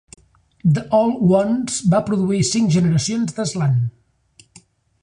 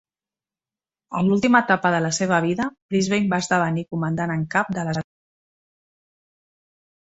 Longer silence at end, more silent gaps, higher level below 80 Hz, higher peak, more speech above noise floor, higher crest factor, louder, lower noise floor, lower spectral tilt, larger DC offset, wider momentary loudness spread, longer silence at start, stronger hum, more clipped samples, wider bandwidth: second, 1.1 s vs 2.1 s; second, none vs 2.82-2.89 s; first, -50 dBFS vs -60 dBFS; about the same, -4 dBFS vs -2 dBFS; second, 37 dB vs over 69 dB; second, 14 dB vs 22 dB; first, -18 LUFS vs -21 LUFS; second, -54 dBFS vs under -90 dBFS; about the same, -6 dB/octave vs -5.5 dB/octave; neither; second, 6 LU vs 9 LU; second, 0.65 s vs 1.1 s; neither; neither; first, 11 kHz vs 8.2 kHz